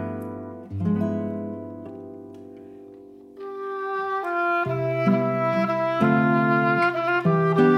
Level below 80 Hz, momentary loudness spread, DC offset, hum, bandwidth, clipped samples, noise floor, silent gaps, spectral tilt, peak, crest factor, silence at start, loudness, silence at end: -68 dBFS; 20 LU; under 0.1%; none; 12 kHz; under 0.1%; -45 dBFS; none; -8.5 dB/octave; -6 dBFS; 18 dB; 0 s; -23 LUFS; 0 s